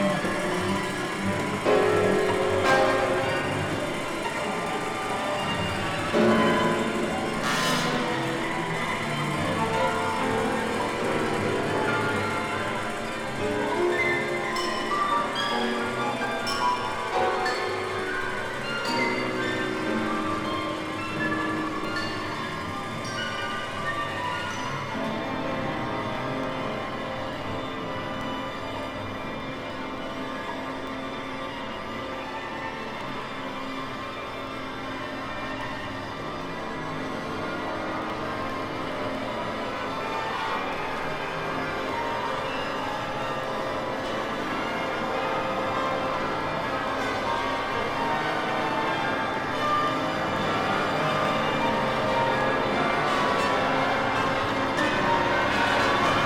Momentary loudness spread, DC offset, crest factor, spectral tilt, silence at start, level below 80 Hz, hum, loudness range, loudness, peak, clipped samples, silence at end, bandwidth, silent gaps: 10 LU; under 0.1%; 18 dB; -4.5 dB/octave; 0 s; -50 dBFS; none; 9 LU; -27 LUFS; -8 dBFS; under 0.1%; 0 s; 19 kHz; none